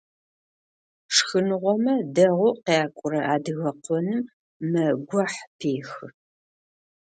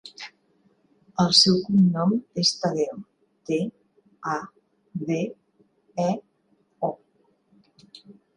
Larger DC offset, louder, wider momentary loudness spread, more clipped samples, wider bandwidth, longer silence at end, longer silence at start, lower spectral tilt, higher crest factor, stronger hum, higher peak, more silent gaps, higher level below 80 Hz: neither; about the same, -24 LUFS vs -23 LUFS; second, 10 LU vs 23 LU; neither; second, 9.4 kHz vs 10.5 kHz; first, 1 s vs 0.25 s; first, 1.1 s vs 0.05 s; about the same, -4.5 dB/octave vs -5 dB/octave; about the same, 22 dB vs 24 dB; neither; about the same, -4 dBFS vs -4 dBFS; first, 4.33-4.60 s, 5.47-5.59 s vs none; second, -72 dBFS vs -66 dBFS